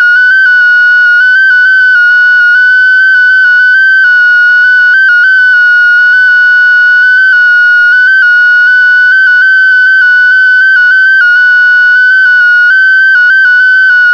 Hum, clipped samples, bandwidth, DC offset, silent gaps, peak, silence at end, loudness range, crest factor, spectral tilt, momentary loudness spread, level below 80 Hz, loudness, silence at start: 50 Hz at -55 dBFS; under 0.1%; 5.4 kHz; 0.4%; none; 0 dBFS; 0 s; 0 LU; 4 dB; 1.5 dB/octave; 0 LU; -50 dBFS; -3 LUFS; 0 s